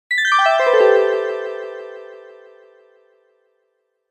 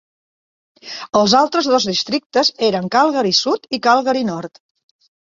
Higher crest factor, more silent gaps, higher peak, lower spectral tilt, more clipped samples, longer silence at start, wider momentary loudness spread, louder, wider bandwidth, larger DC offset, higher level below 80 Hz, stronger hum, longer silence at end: about the same, 16 dB vs 16 dB; second, none vs 2.26-2.30 s; about the same, -2 dBFS vs -2 dBFS; second, 0 dB/octave vs -3.5 dB/octave; neither; second, 0.1 s vs 0.85 s; first, 22 LU vs 11 LU; about the same, -15 LUFS vs -16 LUFS; first, 8.8 kHz vs 7.6 kHz; neither; second, -78 dBFS vs -60 dBFS; neither; first, 1.85 s vs 0.75 s